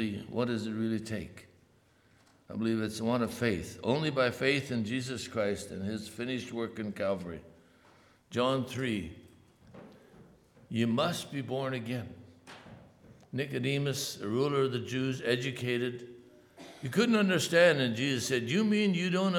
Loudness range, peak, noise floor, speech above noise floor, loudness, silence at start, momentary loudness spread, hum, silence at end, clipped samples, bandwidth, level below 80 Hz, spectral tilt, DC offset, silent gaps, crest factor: 7 LU; -12 dBFS; -65 dBFS; 34 dB; -31 LUFS; 0 s; 15 LU; none; 0 s; under 0.1%; 18 kHz; -66 dBFS; -5 dB/octave; under 0.1%; none; 20 dB